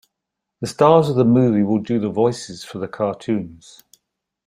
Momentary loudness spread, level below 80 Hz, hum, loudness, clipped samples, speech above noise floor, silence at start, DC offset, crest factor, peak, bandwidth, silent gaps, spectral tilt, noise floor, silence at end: 16 LU; -58 dBFS; none; -18 LUFS; under 0.1%; 63 dB; 0.6 s; under 0.1%; 18 dB; -2 dBFS; 15 kHz; none; -7.5 dB/octave; -81 dBFS; 0.9 s